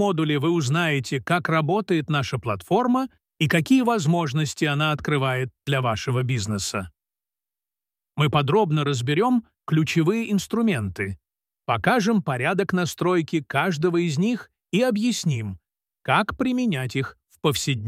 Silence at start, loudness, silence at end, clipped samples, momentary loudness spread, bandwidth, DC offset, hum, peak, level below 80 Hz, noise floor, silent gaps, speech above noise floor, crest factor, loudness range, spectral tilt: 0 s; -23 LUFS; 0 s; under 0.1%; 8 LU; 15.5 kHz; under 0.1%; none; -4 dBFS; -56 dBFS; under -90 dBFS; none; over 68 dB; 18 dB; 3 LU; -5.5 dB/octave